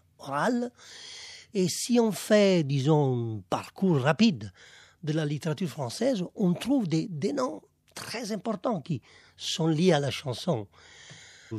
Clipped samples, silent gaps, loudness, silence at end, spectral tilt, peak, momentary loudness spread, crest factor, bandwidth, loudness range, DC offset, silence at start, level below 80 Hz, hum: under 0.1%; none; -28 LUFS; 0 s; -5.5 dB/octave; -8 dBFS; 18 LU; 20 dB; 14.5 kHz; 5 LU; under 0.1%; 0.2 s; -70 dBFS; none